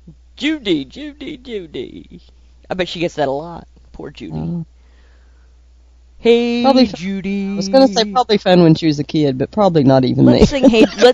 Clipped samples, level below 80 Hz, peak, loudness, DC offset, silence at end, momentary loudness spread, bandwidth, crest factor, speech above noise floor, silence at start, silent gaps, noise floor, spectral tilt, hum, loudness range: 0.2%; -38 dBFS; 0 dBFS; -14 LUFS; under 0.1%; 0 s; 19 LU; 8.8 kHz; 16 dB; 32 dB; 0.1 s; none; -46 dBFS; -6.5 dB/octave; none; 12 LU